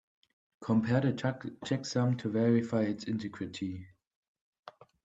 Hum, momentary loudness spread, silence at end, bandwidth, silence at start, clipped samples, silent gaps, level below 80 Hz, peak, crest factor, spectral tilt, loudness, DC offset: none; 12 LU; 0.35 s; 8 kHz; 0.6 s; under 0.1%; 4.07-4.35 s, 4.41-4.53 s, 4.59-4.63 s; -70 dBFS; -16 dBFS; 18 dB; -7 dB/octave; -32 LUFS; under 0.1%